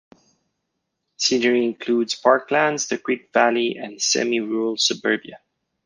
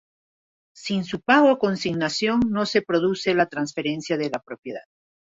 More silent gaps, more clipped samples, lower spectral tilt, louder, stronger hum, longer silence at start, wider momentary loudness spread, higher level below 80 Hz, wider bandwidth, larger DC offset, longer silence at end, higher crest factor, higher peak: second, none vs 4.59-4.63 s; neither; second, -2 dB/octave vs -5 dB/octave; about the same, -20 LUFS vs -22 LUFS; neither; first, 1.2 s vs 0.75 s; second, 6 LU vs 17 LU; second, -70 dBFS vs -58 dBFS; first, 10.5 kHz vs 8 kHz; neither; about the same, 0.5 s vs 0.5 s; about the same, 20 dB vs 18 dB; about the same, -2 dBFS vs -4 dBFS